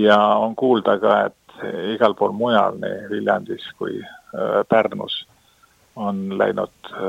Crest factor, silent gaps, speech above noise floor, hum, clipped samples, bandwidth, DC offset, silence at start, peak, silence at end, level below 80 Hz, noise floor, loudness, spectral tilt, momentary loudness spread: 20 dB; none; 37 dB; none; under 0.1%; 11.5 kHz; under 0.1%; 0 s; 0 dBFS; 0 s; -66 dBFS; -56 dBFS; -20 LUFS; -6.5 dB/octave; 12 LU